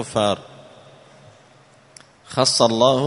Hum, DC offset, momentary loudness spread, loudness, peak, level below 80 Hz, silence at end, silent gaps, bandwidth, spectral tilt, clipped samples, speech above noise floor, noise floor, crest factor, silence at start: none; under 0.1%; 13 LU; -19 LUFS; 0 dBFS; -60 dBFS; 0 s; none; 11 kHz; -4 dB/octave; under 0.1%; 33 dB; -51 dBFS; 22 dB; 0 s